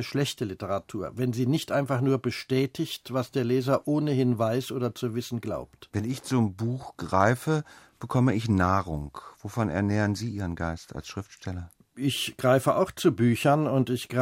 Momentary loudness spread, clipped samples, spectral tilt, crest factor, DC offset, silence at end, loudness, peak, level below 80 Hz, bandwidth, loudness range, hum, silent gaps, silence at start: 14 LU; under 0.1%; -6.5 dB/octave; 20 dB; under 0.1%; 0 s; -27 LUFS; -6 dBFS; -54 dBFS; 16 kHz; 3 LU; none; none; 0 s